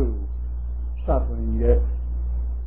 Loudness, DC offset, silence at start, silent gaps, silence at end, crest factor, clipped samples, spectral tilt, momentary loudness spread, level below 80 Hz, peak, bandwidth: -25 LUFS; 1%; 0 s; none; 0 s; 16 dB; under 0.1%; -13.5 dB/octave; 10 LU; -24 dBFS; -6 dBFS; 2.6 kHz